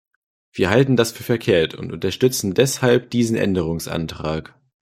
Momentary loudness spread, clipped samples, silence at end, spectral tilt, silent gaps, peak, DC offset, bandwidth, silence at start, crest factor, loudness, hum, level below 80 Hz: 10 LU; under 0.1%; 0.55 s; -5 dB/octave; none; 0 dBFS; under 0.1%; 16 kHz; 0.55 s; 20 dB; -20 LUFS; none; -50 dBFS